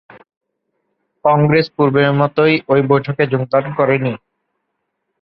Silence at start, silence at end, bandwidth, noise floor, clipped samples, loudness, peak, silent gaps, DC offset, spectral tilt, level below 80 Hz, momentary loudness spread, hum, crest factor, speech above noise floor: 1.25 s; 1.05 s; 5.8 kHz; -73 dBFS; under 0.1%; -15 LUFS; 0 dBFS; none; under 0.1%; -10 dB/octave; -56 dBFS; 5 LU; none; 16 dB; 59 dB